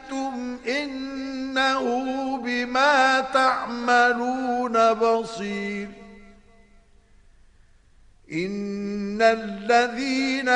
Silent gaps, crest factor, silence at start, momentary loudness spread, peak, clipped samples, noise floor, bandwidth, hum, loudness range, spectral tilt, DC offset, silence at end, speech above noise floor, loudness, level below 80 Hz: none; 18 dB; 0 s; 12 LU; -6 dBFS; under 0.1%; -55 dBFS; 10.5 kHz; none; 14 LU; -4 dB/octave; under 0.1%; 0 s; 33 dB; -23 LUFS; -56 dBFS